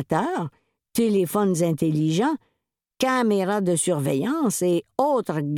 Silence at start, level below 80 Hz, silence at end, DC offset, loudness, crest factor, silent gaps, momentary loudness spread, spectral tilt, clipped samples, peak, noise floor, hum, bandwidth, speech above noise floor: 0 s; -66 dBFS; 0 s; under 0.1%; -23 LUFS; 18 dB; none; 5 LU; -5.5 dB/octave; under 0.1%; -6 dBFS; -79 dBFS; none; 19 kHz; 57 dB